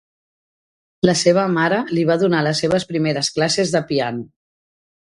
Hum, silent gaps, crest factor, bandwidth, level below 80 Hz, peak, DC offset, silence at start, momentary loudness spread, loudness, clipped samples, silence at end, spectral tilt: none; none; 20 dB; 11.5 kHz; -56 dBFS; 0 dBFS; under 0.1%; 1.05 s; 6 LU; -18 LUFS; under 0.1%; 0.8 s; -4.5 dB/octave